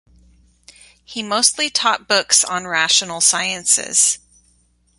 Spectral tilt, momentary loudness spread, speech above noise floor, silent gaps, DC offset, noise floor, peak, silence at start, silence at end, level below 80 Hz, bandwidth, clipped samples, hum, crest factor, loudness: 0.5 dB/octave; 8 LU; 41 dB; none; under 0.1%; -59 dBFS; 0 dBFS; 1.1 s; 0.8 s; -58 dBFS; 16 kHz; under 0.1%; 60 Hz at -55 dBFS; 20 dB; -15 LUFS